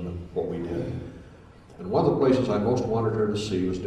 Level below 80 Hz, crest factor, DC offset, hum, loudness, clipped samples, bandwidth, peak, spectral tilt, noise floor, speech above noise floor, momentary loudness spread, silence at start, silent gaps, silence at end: -48 dBFS; 18 dB; under 0.1%; none; -26 LUFS; under 0.1%; 10.5 kHz; -8 dBFS; -7.5 dB/octave; -49 dBFS; 25 dB; 12 LU; 0 s; none; 0 s